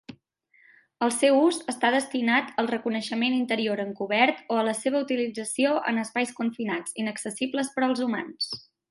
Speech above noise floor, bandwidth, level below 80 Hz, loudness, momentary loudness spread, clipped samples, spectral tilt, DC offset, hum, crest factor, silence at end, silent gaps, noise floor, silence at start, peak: 38 dB; 12 kHz; -76 dBFS; -26 LUFS; 8 LU; under 0.1%; -3.5 dB/octave; under 0.1%; none; 20 dB; 0.3 s; none; -64 dBFS; 0.1 s; -6 dBFS